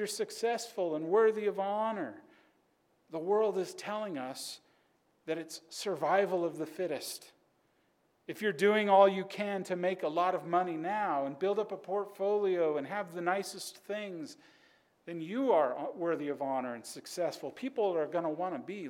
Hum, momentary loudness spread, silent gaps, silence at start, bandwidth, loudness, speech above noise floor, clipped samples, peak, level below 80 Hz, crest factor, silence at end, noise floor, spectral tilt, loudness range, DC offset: none; 14 LU; none; 0 s; 17 kHz; -33 LUFS; 40 dB; under 0.1%; -12 dBFS; -88 dBFS; 22 dB; 0 s; -73 dBFS; -4.5 dB/octave; 6 LU; under 0.1%